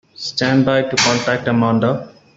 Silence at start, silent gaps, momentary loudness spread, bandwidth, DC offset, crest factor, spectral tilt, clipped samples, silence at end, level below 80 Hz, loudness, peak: 0.2 s; none; 6 LU; 8 kHz; under 0.1%; 16 dB; -4.5 dB/octave; under 0.1%; 0.3 s; -54 dBFS; -16 LUFS; -2 dBFS